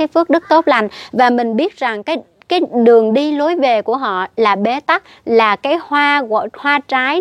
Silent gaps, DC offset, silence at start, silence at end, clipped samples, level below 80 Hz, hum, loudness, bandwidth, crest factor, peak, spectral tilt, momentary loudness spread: none; under 0.1%; 0 s; 0 s; under 0.1%; -64 dBFS; none; -14 LUFS; 9.2 kHz; 14 dB; 0 dBFS; -5.5 dB/octave; 7 LU